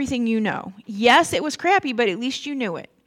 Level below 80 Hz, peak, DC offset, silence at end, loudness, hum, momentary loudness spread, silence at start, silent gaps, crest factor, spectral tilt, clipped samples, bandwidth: -56 dBFS; -2 dBFS; under 0.1%; 0.25 s; -20 LUFS; none; 12 LU; 0 s; none; 18 dB; -3.5 dB/octave; under 0.1%; 16 kHz